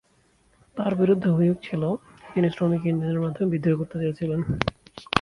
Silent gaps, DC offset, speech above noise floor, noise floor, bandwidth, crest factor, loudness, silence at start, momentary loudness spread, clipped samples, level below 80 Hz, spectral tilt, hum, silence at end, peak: none; under 0.1%; 39 dB; -63 dBFS; 11 kHz; 24 dB; -25 LUFS; 0.75 s; 8 LU; under 0.1%; -50 dBFS; -8 dB/octave; none; 0 s; -2 dBFS